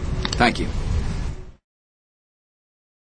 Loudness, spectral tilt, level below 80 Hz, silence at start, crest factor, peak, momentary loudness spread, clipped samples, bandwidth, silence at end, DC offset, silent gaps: -23 LUFS; -5 dB/octave; -30 dBFS; 0 s; 26 dB; 0 dBFS; 14 LU; under 0.1%; 10 kHz; 1.5 s; under 0.1%; none